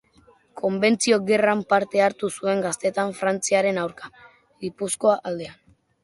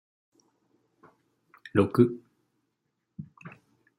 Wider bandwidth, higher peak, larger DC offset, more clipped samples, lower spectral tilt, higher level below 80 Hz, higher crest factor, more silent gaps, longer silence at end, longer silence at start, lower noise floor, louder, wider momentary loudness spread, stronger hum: second, 11.5 kHz vs 15 kHz; about the same, -6 dBFS vs -8 dBFS; neither; neither; second, -4 dB/octave vs -9 dB/octave; first, -66 dBFS vs -72 dBFS; second, 18 dB vs 24 dB; neither; about the same, 0.5 s vs 0.5 s; second, 0.55 s vs 1.75 s; second, -57 dBFS vs -80 dBFS; first, -22 LUFS vs -25 LUFS; second, 14 LU vs 26 LU; neither